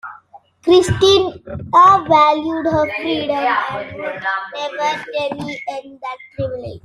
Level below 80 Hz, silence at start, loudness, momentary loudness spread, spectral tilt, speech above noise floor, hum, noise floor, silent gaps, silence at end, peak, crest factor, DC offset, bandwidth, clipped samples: -48 dBFS; 0.05 s; -16 LUFS; 17 LU; -5 dB/octave; 29 dB; none; -45 dBFS; none; 0.05 s; -2 dBFS; 16 dB; under 0.1%; 12.5 kHz; under 0.1%